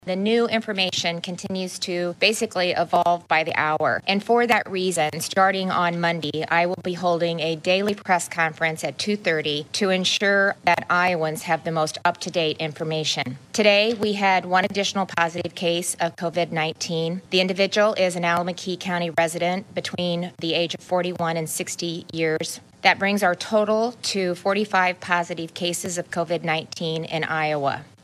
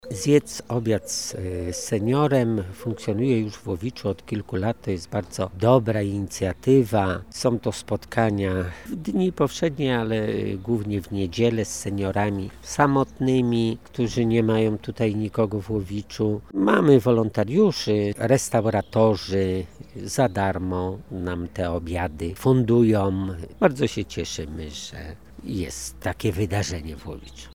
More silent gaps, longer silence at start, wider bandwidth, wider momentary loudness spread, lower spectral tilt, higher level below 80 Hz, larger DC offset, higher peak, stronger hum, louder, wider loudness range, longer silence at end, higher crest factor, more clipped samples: neither; about the same, 0.05 s vs 0.05 s; about the same, 15.5 kHz vs 17 kHz; second, 7 LU vs 11 LU; second, -3.5 dB/octave vs -6 dB/octave; second, -70 dBFS vs -46 dBFS; second, under 0.1% vs 0.3%; about the same, -2 dBFS vs -4 dBFS; neither; about the same, -22 LUFS vs -24 LUFS; about the same, 3 LU vs 5 LU; first, 0.2 s vs 0 s; about the same, 20 dB vs 20 dB; neither